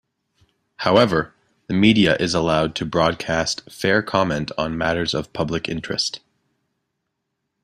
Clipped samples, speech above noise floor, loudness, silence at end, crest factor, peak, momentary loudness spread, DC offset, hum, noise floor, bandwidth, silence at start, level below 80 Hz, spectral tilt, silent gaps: under 0.1%; 57 dB; -20 LUFS; 1.45 s; 20 dB; -2 dBFS; 9 LU; under 0.1%; none; -77 dBFS; 14 kHz; 0.8 s; -48 dBFS; -5 dB/octave; none